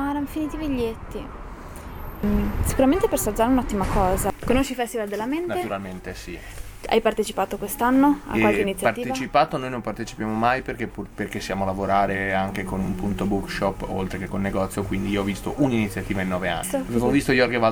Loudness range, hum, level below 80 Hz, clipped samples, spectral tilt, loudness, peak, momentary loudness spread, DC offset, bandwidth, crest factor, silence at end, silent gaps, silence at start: 4 LU; none; -36 dBFS; under 0.1%; -5.5 dB/octave; -24 LUFS; -6 dBFS; 14 LU; under 0.1%; 18 kHz; 18 dB; 0 s; none; 0 s